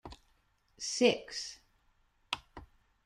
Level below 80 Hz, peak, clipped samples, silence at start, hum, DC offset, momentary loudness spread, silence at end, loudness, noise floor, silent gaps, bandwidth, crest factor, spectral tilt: -64 dBFS; -12 dBFS; under 0.1%; 0.05 s; none; under 0.1%; 26 LU; 0.4 s; -34 LUFS; -72 dBFS; none; 12.5 kHz; 24 dB; -2.5 dB/octave